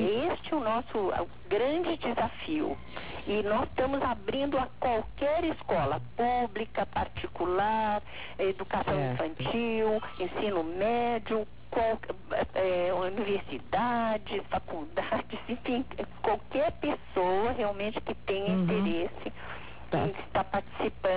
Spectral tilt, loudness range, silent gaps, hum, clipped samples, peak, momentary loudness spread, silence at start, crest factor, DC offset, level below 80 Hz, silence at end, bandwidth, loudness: -4.5 dB/octave; 2 LU; none; none; under 0.1%; -16 dBFS; 7 LU; 0 s; 14 dB; 0.7%; -50 dBFS; 0 s; 4 kHz; -31 LUFS